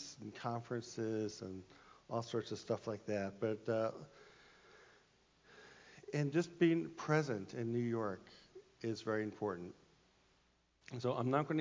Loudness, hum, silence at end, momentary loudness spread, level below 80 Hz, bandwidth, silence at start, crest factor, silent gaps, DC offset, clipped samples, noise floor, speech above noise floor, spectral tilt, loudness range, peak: -40 LUFS; none; 0 s; 21 LU; -76 dBFS; 7.6 kHz; 0 s; 20 dB; none; under 0.1%; under 0.1%; -75 dBFS; 36 dB; -6.5 dB/octave; 6 LU; -20 dBFS